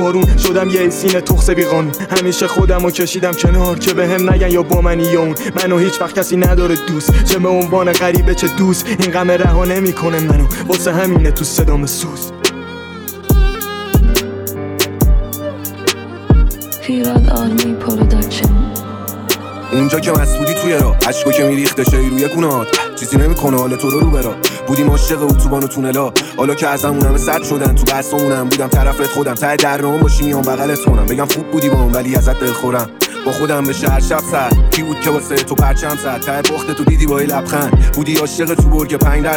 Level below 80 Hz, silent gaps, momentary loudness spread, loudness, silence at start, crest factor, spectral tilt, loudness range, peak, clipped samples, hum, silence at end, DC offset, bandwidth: -18 dBFS; none; 5 LU; -14 LUFS; 0 s; 12 dB; -5 dB/octave; 3 LU; 0 dBFS; under 0.1%; none; 0 s; under 0.1%; 19.5 kHz